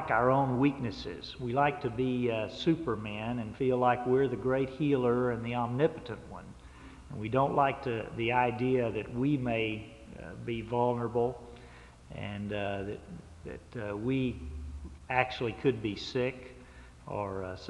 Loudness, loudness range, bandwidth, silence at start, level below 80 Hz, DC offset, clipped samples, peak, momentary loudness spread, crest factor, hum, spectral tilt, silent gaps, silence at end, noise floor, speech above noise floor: -31 LUFS; 6 LU; 11 kHz; 0 s; -54 dBFS; under 0.1%; under 0.1%; -12 dBFS; 19 LU; 20 dB; none; -7.5 dB/octave; none; 0 s; -52 dBFS; 21 dB